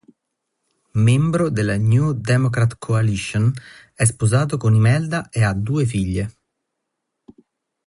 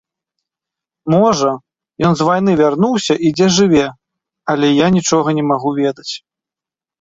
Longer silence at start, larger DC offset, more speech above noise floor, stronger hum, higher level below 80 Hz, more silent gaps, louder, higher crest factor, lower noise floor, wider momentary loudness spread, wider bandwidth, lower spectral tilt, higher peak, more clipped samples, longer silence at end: about the same, 0.95 s vs 1.05 s; neither; second, 60 dB vs 75 dB; neither; first, -44 dBFS vs -50 dBFS; neither; second, -19 LUFS vs -14 LUFS; about the same, 16 dB vs 14 dB; second, -78 dBFS vs -88 dBFS; second, 7 LU vs 14 LU; first, 11.5 kHz vs 8 kHz; about the same, -6.5 dB/octave vs -5.5 dB/octave; about the same, -4 dBFS vs -2 dBFS; neither; first, 1.55 s vs 0.85 s